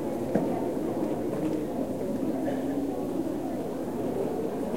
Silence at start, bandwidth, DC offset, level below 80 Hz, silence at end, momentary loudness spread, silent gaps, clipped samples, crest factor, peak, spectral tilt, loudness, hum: 0 s; 16.5 kHz; 0.5%; -56 dBFS; 0 s; 3 LU; none; under 0.1%; 20 dB; -10 dBFS; -7.5 dB/octave; -30 LUFS; none